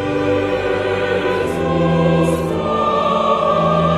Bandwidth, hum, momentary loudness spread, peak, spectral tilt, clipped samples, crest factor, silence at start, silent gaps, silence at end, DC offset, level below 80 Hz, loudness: 13 kHz; none; 4 LU; -4 dBFS; -7 dB/octave; under 0.1%; 12 dB; 0 s; none; 0 s; under 0.1%; -40 dBFS; -17 LUFS